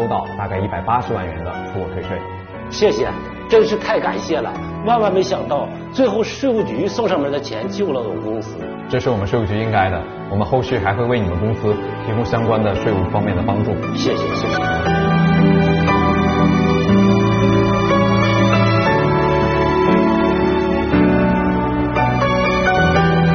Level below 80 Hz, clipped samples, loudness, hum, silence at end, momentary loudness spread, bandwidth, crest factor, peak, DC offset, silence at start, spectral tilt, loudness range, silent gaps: -34 dBFS; under 0.1%; -17 LUFS; none; 0 s; 10 LU; 6.6 kHz; 14 dB; -2 dBFS; under 0.1%; 0 s; -5.5 dB/octave; 6 LU; none